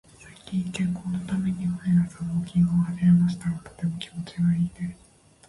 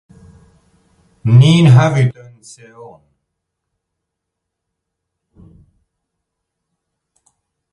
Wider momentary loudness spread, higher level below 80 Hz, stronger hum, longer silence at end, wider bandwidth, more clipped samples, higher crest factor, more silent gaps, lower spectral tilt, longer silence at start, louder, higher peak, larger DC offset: about the same, 12 LU vs 11 LU; about the same, -52 dBFS vs -50 dBFS; neither; second, 0.55 s vs 5.6 s; about the same, 11.5 kHz vs 11 kHz; neither; about the same, 14 dB vs 18 dB; neither; about the same, -7.5 dB/octave vs -7 dB/octave; second, 0.25 s vs 1.25 s; second, -26 LUFS vs -11 LUFS; second, -10 dBFS vs 0 dBFS; neither